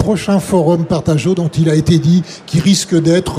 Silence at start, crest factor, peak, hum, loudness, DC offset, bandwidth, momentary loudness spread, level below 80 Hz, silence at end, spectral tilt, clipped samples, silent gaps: 0 s; 12 dB; 0 dBFS; none; -13 LUFS; under 0.1%; 14.5 kHz; 4 LU; -38 dBFS; 0 s; -6 dB/octave; under 0.1%; none